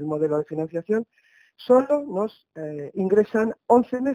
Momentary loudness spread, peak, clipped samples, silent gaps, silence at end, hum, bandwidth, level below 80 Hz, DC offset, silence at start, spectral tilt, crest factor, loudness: 15 LU; -4 dBFS; under 0.1%; none; 0 s; none; 9.6 kHz; -66 dBFS; under 0.1%; 0 s; -8 dB/octave; 20 dB; -23 LUFS